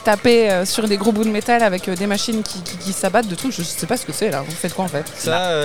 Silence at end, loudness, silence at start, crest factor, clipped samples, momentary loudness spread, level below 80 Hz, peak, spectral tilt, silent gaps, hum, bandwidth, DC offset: 0 s; -19 LUFS; 0 s; 16 dB; under 0.1%; 9 LU; -50 dBFS; -2 dBFS; -4 dB/octave; none; none; 20 kHz; 1%